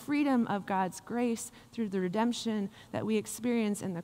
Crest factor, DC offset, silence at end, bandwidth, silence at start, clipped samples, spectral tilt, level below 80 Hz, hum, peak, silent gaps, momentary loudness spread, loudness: 14 dB; under 0.1%; 0 s; 16 kHz; 0 s; under 0.1%; -5 dB/octave; -70 dBFS; none; -18 dBFS; none; 9 LU; -32 LUFS